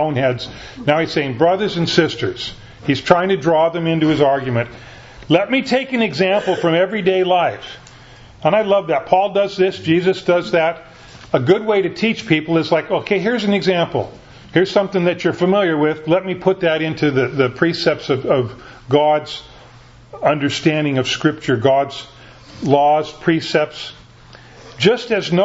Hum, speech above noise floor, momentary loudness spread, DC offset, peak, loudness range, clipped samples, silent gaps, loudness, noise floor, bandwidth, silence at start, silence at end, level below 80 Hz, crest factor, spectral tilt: none; 26 dB; 9 LU; under 0.1%; 0 dBFS; 2 LU; under 0.1%; none; -17 LUFS; -43 dBFS; 8 kHz; 0 s; 0 s; -50 dBFS; 18 dB; -6 dB/octave